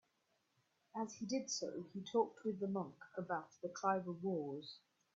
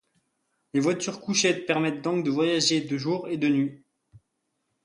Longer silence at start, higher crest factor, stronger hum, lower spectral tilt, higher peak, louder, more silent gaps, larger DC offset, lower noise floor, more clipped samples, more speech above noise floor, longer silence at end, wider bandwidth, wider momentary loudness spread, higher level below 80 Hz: first, 0.95 s vs 0.75 s; about the same, 22 dB vs 20 dB; neither; about the same, -5 dB/octave vs -4 dB/octave; second, -22 dBFS vs -8 dBFS; second, -43 LUFS vs -25 LUFS; neither; neither; first, -82 dBFS vs -78 dBFS; neither; second, 40 dB vs 53 dB; second, 0.4 s vs 0.65 s; second, 7.4 kHz vs 11.5 kHz; first, 11 LU vs 6 LU; second, -88 dBFS vs -70 dBFS